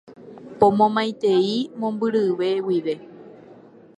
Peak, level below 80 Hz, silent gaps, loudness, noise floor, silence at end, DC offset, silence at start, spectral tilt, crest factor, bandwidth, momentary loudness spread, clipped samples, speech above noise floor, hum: -2 dBFS; -64 dBFS; none; -21 LUFS; -47 dBFS; 0.45 s; under 0.1%; 0.1 s; -6.5 dB/octave; 20 dB; 9.8 kHz; 12 LU; under 0.1%; 27 dB; none